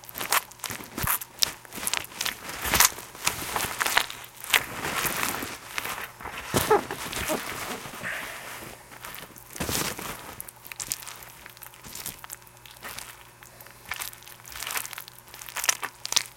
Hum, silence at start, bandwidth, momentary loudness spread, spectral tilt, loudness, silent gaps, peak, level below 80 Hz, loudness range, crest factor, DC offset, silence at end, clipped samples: none; 0 s; 17 kHz; 18 LU; -1.5 dB/octave; -28 LUFS; none; 0 dBFS; -52 dBFS; 12 LU; 32 dB; under 0.1%; 0 s; under 0.1%